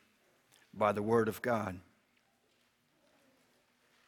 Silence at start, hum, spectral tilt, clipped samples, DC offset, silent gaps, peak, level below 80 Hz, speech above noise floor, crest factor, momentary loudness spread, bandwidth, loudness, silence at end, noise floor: 0.75 s; none; -6.5 dB/octave; under 0.1%; under 0.1%; none; -16 dBFS; -74 dBFS; 41 dB; 22 dB; 18 LU; 18.5 kHz; -33 LUFS; 2.3 s; -74 dBFS